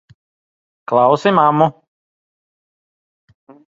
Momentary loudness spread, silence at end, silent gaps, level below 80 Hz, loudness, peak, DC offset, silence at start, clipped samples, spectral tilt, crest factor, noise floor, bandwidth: 6 LU; 2 s; none; -62 dBFS; -14 LUFS; 0 dBFS; under 0.1%; 0.9 s; under 0.1%; -7 dB/octave; 18 dB; under -90 dBFS; 7.8 kHz